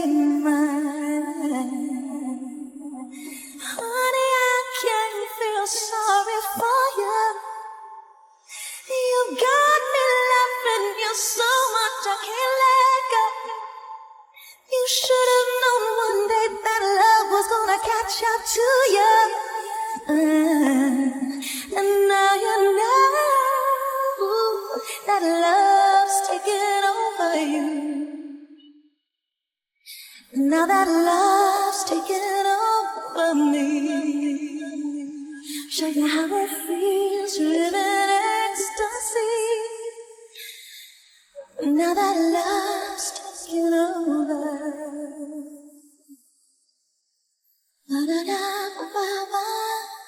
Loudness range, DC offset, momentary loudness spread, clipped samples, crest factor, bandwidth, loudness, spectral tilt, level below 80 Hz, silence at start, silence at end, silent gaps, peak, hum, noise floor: 8 LU; under 0.1%; 16 LU; under 0.1%; 16 dB; 17.5 kHz; -21 LUFS; -1 dB/octave; -66 dBFS; 0 s; 0.05 s; none; -6 dBFS; none; -85 dBFS